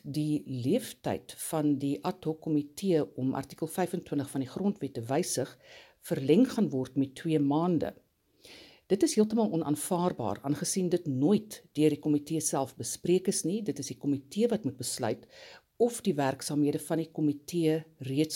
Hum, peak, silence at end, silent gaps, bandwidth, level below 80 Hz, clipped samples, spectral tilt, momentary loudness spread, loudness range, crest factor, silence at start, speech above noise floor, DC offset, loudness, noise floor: none; -12 dBFS; 0 s; none; 17 kHz; -70 dBFS; under 0.1%; -5.5 dB/octave; 8 LU; 3 LU; 18 dB; 0.05 s; 28 dB; under 0.1%; -30 LUFS; -57 dBFS